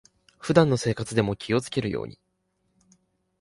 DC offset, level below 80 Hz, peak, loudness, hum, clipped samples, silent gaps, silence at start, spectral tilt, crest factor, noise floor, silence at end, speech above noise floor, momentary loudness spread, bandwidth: under 0.1%; -54 dBFS; -4 dBFS; -25 LUFS; none; under 0.1%; none; 0.45 s; -6 dB/octave; 24 dB; -73 dBFS; 1.3 s; 49 dB; 14 LU; 11.5 kHz